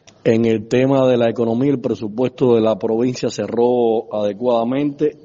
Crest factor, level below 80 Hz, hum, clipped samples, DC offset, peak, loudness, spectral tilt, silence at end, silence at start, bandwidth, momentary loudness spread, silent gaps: 14 dB; -56 dBFS; none; under 0.1%; under 0.1%; -2 dBFS; -17 LUFS; -6.5 dB/octave; 0.1 s; 0.25 s; 7.6 kHz; 6 LU; none